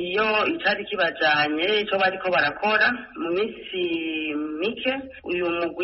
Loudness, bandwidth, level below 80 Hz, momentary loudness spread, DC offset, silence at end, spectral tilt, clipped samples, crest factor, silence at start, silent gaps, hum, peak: -23 LUFS; 6 kHz; -58 dBFS; 8 LU; under 0.1%; 0 s; -1 dB/octave; under 0.1%; 16 dB; 0 s; none; none; -8 dBFS